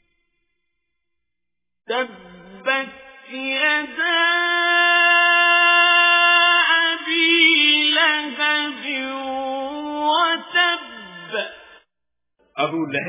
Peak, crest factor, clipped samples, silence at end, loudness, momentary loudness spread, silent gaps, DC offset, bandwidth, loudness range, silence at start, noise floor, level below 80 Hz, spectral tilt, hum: -2 dBFS; 18 dB; under 0.1%; 0 s; -16 LUFS; 15 LU; none; under 0.1%; 3.9 kHz; 11 LU; 1.9 s; -85 dBFS; -68 dBFS; -5.5 dB/octave; none